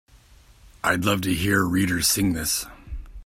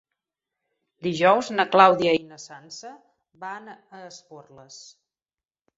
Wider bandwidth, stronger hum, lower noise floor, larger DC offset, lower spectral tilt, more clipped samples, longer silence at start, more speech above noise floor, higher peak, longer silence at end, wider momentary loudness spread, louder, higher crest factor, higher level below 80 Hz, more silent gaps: first, 16.5 kHz vs 7.8 kHz; neither; second, -52 dBFS vs under -90 dBFS; neither; about the same, -3.5 dB/octave vs -4.5 dB/octave; neither; second, 0.65 s vs 1.05 s; second, 30 dB vs over 66 dB; second, -6 dBFS vs -2 dBFS; second, 0 s vs 1.35 s; second, 14 LU vs 27 LU; about the same, -22 LUFS vs -20 LUFS; second, 18 dB vs 24 dB; first, -42 dBFS vs -70 dBFS; neither